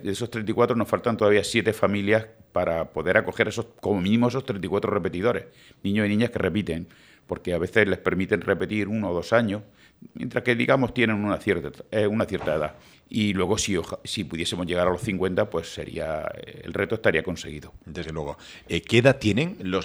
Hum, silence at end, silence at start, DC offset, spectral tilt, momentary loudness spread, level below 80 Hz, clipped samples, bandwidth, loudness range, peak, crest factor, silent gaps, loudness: none; 0 s; 0 s; under 0.1%; -5.5 dB/octave; 12 LU; -52 dBFS; under 0.1%; over 20 kHz; 3 LU; -2 dBFS; 22 dB; none; -25 LUFS